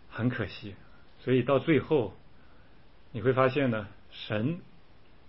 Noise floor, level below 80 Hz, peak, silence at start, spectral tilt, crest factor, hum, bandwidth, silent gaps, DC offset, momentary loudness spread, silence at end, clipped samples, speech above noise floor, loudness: -58 dBFS; -60 dBFS; -10 dBFS; 0.1 s; -11 dB/octave; 20 dB; none; 5.8 kHz; none; 0.3%; 18 LU; 0.65 s; under 0.1%; 30 dB; -29 LUFS